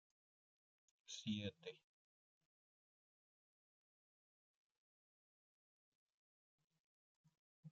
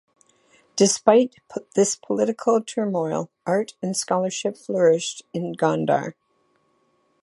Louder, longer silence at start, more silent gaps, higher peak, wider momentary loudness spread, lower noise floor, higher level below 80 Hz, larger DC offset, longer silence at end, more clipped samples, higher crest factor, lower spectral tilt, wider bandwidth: second, -50 LUFS vs -22 LUFS; first, 1.1 s vs 0.75 s; first, 1.84-6.07 s, 6.14-6.58 s, 6.64-6.68 s, 6.79-7.24 s, 7.39-7.63 s vs none; second, -34 dBFS vs -2 dBFS; first, 21 LU vs 11 LU; first, under -90 dBFS vs -66 dBFS; second, under -90 dBFS vs -72 dBFS; neither; second, 0 s vs 1.1 s; neither; about the same, 26 dB vs 22 dB; about the same, -5 dB/octave vs -4.5 dB/octave; second, 7.2 kHz vs 11.5 kHz